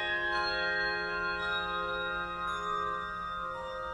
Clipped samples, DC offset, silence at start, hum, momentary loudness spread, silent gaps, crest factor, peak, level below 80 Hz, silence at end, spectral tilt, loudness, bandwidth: under 0.1%; under 0.1%; 0 s; none; 7 LU; none; 14 dB; -20 dBFS; -54 dBFS; 0 s; -3.5 dB/octave; -33 LUFS; 12.5 kHz